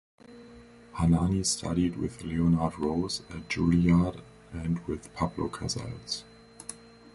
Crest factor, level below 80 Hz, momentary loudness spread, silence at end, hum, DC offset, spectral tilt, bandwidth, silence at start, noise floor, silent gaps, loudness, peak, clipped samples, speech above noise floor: 18 dB; -44 dBFS; 18 LU; 0.05 s; none; under 0.1%; -5.5 dB/octave; 11.5 kHz; 0.3 s; -51 dBFS; none; -29 LUFS; -12 dBFS; under 0.1%; 23 dB